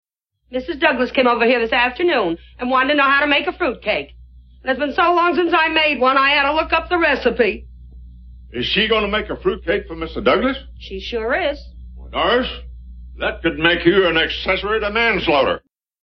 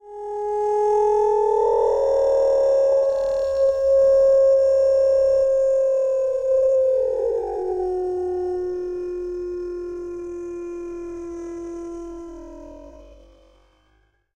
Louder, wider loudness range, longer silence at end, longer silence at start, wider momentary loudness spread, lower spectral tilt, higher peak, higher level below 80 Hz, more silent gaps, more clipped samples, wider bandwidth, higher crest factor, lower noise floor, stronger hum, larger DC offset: first, -17 LUFS vs -20 LUFS; second, 5 LU vs 16 LU; second, 0.45 s vs 1.2 s; first, 0.5 s vs 0.05 s; second, 13 LU vs 16 LU; about the same, -6.5 dB/octave vs -6 dB/octave; first, 0 dBFS vs -10 dBFS; first, -38 dBFS vs -50 dBFS; neither; neither; second, 6.2 kHz vs 8.4 kHz; first, 18 dB vs 10 dB; second, -39 dBFS vs -63 dBFS; neither; neither